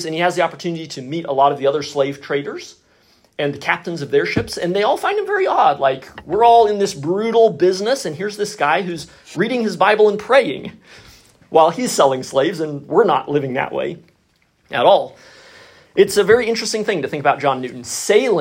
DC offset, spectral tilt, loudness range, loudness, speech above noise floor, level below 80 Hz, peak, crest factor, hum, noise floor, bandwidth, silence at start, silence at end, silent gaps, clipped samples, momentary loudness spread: under 0.1%; -4.5 dB/octave; 5 LU; -17 LUFS; 44 dB; -56 dBFS; 0 dBFS; 18 dB; none; -60 dBFS; 16 kHz; 0 s; 0 s; none; under 0.1%; 12 LU